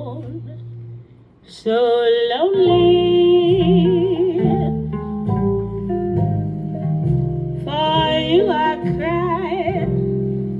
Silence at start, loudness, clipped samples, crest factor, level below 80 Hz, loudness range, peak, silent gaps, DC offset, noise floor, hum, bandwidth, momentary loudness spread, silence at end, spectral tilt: 0 s; -18 LUFS; under 0.1%; 14 dB; -40 dBFS; 5 LU; -4 dBFS; none; under 0.1%; -44 dBFS; none; 5.6 kHz; 12 LU; 0 s; -9 dB/octave